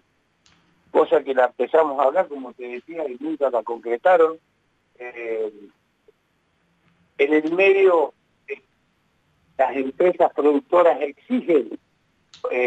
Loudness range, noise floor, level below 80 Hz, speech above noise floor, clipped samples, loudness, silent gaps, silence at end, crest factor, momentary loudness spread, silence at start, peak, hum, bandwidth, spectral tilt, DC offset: 4 LU; -67 dBFS; -74 dBFS; 47 dB; under 0.1%; -20 LUFS; none; 0 s; 16 dB; 18 LU; 0.95 s; -6 dBFS; none; 8 kHz; -6 dB/octave; under 0.1%